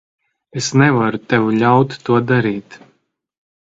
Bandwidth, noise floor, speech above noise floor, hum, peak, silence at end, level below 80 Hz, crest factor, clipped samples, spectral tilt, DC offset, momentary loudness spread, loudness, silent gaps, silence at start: 7.8 kHz; -63 dBFS; 48 dB; none; 0 dBFS; 1 s; -56 dBFS; 16 dB; under 0.1%; -6 dB/octave; under 0.1%; 10 LU; -15 LUFS; none; 0.55 s